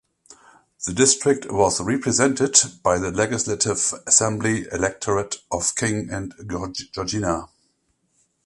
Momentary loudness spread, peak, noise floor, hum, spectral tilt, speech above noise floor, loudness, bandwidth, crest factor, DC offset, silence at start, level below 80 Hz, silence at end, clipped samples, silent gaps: 13 LU; 0 dBFS; -69 dBFS; none; -3 dB/octave; 47 dB; -21 LUFS; 11.5 kHz; 22 dB; under 0.1%; 0.3 s; -48 dBFS; 1 s; under 0.1%; none